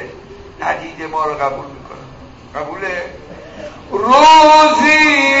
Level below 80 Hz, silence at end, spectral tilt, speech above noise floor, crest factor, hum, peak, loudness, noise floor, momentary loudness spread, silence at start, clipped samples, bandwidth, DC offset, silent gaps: -44 dBFS; 0 s; -3 dB/octave; 24 dB; 12 dB; none; 0 dBFS; -10 LUFS; -36 dBFS; 26 LU; 0 s; under 0.1%; 8 kHz; under 0.1%; none